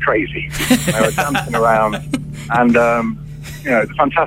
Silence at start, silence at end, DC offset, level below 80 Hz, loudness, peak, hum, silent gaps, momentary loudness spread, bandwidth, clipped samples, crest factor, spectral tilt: 0 s; 0 s; under 0.1%; -38 dBFS; -16 LUFS; 0 dBFS; none; none; 11 LU; 16.5 kHz; under 0.1%; 16 dB; -5 dB/octave